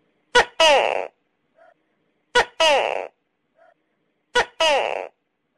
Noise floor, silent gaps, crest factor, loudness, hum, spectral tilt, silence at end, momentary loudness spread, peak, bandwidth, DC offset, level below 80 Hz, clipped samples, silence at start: -71 dBFS; none; 14 dB; -19 LUFS; none; -0.5 dB/octave; 0.5 s; 16 LU; -8 dBFS; 14.5 kHz; under 0.1%; -52 dBFS; under 0.1%; 0.35 s